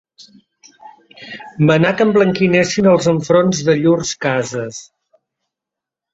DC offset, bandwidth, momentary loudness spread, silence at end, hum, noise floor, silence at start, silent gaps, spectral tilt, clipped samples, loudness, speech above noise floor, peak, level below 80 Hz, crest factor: under 0.1%; 8 kHz; 17 LU; 1.3 s; none; -84 dBFS; 0.85 s; none; -5.5 dB/octave; under 0.1%; -14 LUFS; 70 dB; 0 dBFS; -54 dBFS; 16 dB